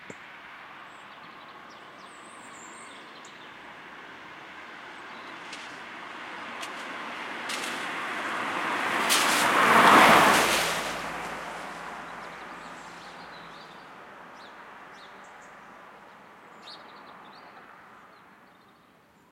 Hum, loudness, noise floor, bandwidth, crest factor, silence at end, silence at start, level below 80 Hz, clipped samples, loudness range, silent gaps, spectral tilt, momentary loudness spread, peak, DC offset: none; -23 LUFS; -59 dBFS; 16.5 kHz; 24 dB; 1.65 s; 0 s; -64 dBFS; under 0.1%; 26 LU; none; -2 dB/octave; 26 LU; -6 dBFS; under 0.1%